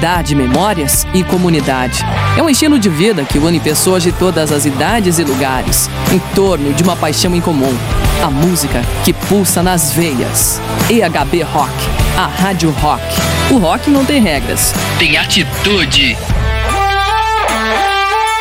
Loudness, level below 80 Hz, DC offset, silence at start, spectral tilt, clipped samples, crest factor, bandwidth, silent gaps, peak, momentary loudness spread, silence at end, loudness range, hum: -12 LUFS; -24 dBFS; under 0.1%; 0 s; -4 dB/octave; under 0.1%; 12 dB; 16.5 kHz; none; 0 dBFS; 4 LU; 0 s; 2 LU; none